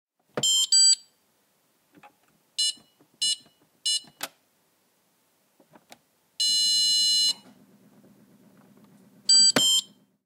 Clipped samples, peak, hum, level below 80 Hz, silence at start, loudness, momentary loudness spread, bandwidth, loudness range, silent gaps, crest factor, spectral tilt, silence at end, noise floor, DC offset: under 0.1%; -6 dBFS; none; -82 dBFS; 0.35 s; -21 LUFS; 18 LU; 16 kHz; 10 LU; none; 20 dB; 1 dB/octave; 0.4 s; -68 dBFS; under 0.1%